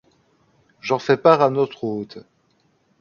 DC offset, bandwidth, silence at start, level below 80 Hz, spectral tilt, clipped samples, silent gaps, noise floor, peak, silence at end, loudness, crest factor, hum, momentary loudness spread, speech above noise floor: under 0.1%; 7.2 kHz; 0.85 s; -66 dBFS; -6.5 dB/octave; under 0.1%; none; -63 dBFS; 0 dBFS; 0.8 s; -19 LUFS; 22 dB; none; 17 LU; 45 dB